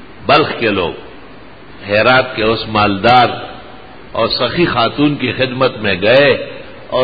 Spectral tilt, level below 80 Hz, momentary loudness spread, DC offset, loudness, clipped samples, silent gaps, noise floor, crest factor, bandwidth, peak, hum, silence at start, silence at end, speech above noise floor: -7.5 dB/octave; -42 dBFS; 16 LU; 1%; -13 LUFS; under 0.1%; none; -37 dBFS; 14 dB; 7.8 kHz; 0 dBFS; none; 0 s; 0 s; 24 dB